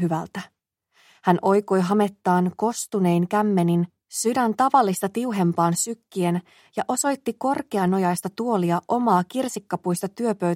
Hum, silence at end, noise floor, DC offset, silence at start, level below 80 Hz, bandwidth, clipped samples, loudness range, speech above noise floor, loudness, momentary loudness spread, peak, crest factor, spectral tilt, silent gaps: none; 0 s; -65 dBFS; under 0.1%; 0 s; -70 dBFS; 16 kHz; under 0.1%; 2 LU; 43 dB; -23 LUFS; 7 LU; -2 dBFS; 20 dB; -6 dB/octave; none